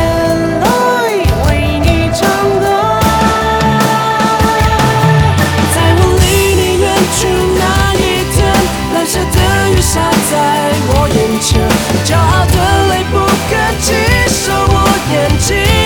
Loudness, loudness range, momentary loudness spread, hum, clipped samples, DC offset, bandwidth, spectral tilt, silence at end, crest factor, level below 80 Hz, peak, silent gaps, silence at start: -11 LUFS; 1 LU; 3 LU; none; under 0.1%; under 0.1%; 20 kHz; -4.5 dB/octave; 0 s; 10 dB; -20 dBFS; 0 dBFS; none; 0 s